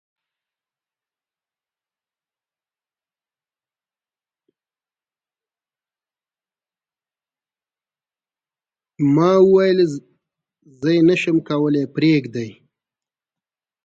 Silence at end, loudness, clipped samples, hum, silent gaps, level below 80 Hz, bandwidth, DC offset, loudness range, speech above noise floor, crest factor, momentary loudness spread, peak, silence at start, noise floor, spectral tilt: 1.35 s; -17 LUFS; under 0.1%; none; none; -66 dBFS; 7.8 kHz; under 0.1%; 4 LU; over 74 dB; 20 dB; 15 LU; -4 dBFS; 9 s; under -90 dBFS; -7.5 dB/octave